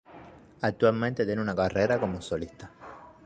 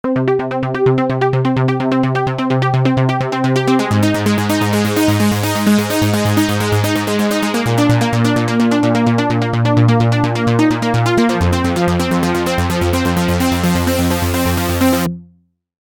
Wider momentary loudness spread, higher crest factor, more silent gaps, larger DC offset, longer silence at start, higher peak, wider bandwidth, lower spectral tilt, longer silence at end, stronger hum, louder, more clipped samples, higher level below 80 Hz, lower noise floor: first, 21 LU vs 3 LU; first, 20 dB vs 14 dB; neither; neither; about the same, 0.1 s vs 0.05 s; second, -10 dBFS vs -2 dBFS; second, 9.2 kHz vs 19.5 kHz; about the same, -7 dB/octave vs -6 dB/octave; second, 0.15 s vs 0.7 s; neither; second, -28 LUFS vs -15 LUFS; neither; second, -54 dBFS vs -36 dBFS; about the same, -50 dBFS vs -53 dBFS